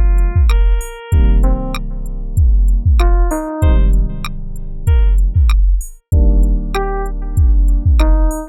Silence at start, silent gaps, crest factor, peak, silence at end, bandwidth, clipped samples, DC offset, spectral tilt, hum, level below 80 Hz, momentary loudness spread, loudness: 0 s; none; 10 dB; -2 dBFS; 0 s; 12 kHz; under 0.1%; under 0.1%; -7 dB/octave; none; -12 dBFS; 9 LU; -15 LUFS